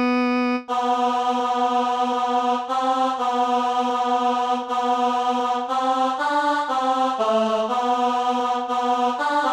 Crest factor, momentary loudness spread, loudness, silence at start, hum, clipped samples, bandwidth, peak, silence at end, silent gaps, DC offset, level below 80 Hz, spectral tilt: 12 dB; 2 LU; -21 LUFS; 0 s; none; under 0.1%; 11.5 kHz; -10 dBFS; 0 s; none; under 0.1%; -66 dBFS; -3 dB/octave